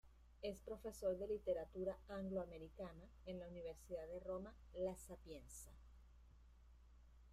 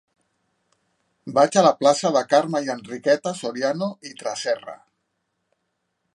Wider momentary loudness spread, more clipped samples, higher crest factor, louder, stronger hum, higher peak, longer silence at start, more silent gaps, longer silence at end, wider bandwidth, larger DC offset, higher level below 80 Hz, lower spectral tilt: first, 24 LU vs 13 LU; neither; about the same, 18 dB vs 20 dB; second, -50 LUFS vs -21 LUFS; neither; second, -32 dBFS vs -2 dBFS; second, 0.05 s vs 1.25 s; neither; second, 0 s vs 1.4 s; first, 15.5 kHz vs 11.5 kHz; neither; first, -64 dBFS vs -76 dBFS; first, -6 dB/octave vs -4 dB/octave